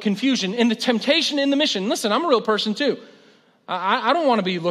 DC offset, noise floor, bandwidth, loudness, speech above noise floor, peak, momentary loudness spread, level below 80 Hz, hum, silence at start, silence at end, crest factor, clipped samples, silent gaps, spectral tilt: under 0.1%; -54 dBFS; 13.5 kHz; -20 LUFS; 34 dB; -4 dBFS; 5 LU; -78 dBFS; none; 0 s; 0 s; 18 dB; under 0.1%; none; -4 dB/octave